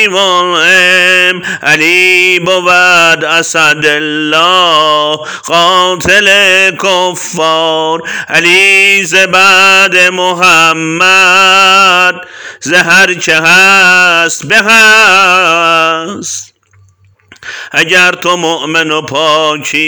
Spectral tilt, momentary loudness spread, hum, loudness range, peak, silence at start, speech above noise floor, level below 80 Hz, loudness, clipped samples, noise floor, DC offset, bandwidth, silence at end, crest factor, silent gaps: -1.5 dB/octave; 9 LU; none; 5 LU; 0 dBFS; 0 s; 38 dB; -50 dBFS; -5 LUFS; 2%; -46 dBFS; 0.4%; over 20 kHz; 0 s; 8 dB; none